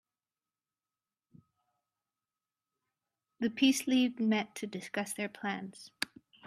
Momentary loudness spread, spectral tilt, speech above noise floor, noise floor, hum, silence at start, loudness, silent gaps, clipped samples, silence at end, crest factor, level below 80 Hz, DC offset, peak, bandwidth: 12 LU; -3.5 dB/octave; over 58 dB; under -90 dBFS; none; 3.4 s; -33 LUFS; none; under 0.1%; 0.4 s; 26 dB; -82 dBFS; under 0.1%; -10 dBFS; 15 kHz